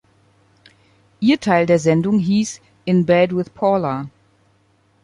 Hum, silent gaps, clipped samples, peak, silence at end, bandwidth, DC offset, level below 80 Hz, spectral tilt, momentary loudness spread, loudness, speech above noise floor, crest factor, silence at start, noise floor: none; none; under 0.1%; -2 dBFS; 0.95 s; 11.5 kHz; under 0.1%; -56 dBFS; -6.5 dB/octave; 11 LU; -17 LUFS; 42 dB; 16 dB; 1.2 s; -59 dBFS